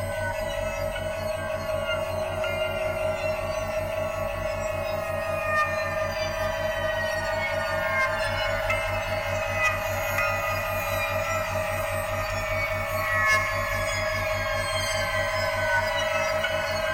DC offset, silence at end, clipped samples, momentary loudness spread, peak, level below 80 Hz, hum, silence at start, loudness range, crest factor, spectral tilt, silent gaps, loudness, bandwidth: under 0.1%; 0 s; under 0.1%; 5 LU; -12 dBFS; -42 dBFS; none; 0 s; 3 LU; 14 dB; -3.5 dB/octave; none; -26 LUFS; 16.5 kHz